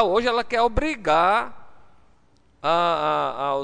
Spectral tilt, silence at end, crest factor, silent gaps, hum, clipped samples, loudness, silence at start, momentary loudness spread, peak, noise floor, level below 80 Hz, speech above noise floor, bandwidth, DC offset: -5 dB/octave; 0 s; 16 dB; none; none; under 0.1%; -22 LUFS; 0 s; 6 LU; -6 dBFS; -60 dBFS; -40 dBFS; 39 dB; 10 kHz; under 0.1%